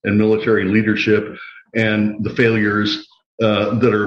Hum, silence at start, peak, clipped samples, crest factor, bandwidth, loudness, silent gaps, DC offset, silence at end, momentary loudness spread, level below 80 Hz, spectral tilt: none; 0.05 s; -2 dBFS; under 0.1%; 14 dB; 7 kHz; -17 LUFS; 3.26-3.38 s; under 0.1%; 0 s; 8 LU; -54 dBFS; -7 dB/octave